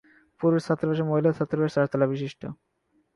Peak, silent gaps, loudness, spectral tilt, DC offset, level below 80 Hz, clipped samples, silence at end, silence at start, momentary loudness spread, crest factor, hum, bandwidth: -10 dBFS; none; -25 LUFS; -8.5 dB/octave; under 0.1%; -64 dBFS; under 0.1%; 0.6 s; 0.4 s; 10 LU; 16 dB; none; 11.5 kHz